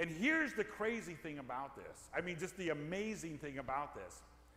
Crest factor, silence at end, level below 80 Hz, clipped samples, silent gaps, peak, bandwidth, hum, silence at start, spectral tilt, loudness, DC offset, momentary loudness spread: 18 dB; 0 s; -66 dBFS; under 0.1%; none; -22 dBFS; 16 kHz; none; 0 s; -4.5 dB/octave; -41 LUFS; under 0.1%; 15 LU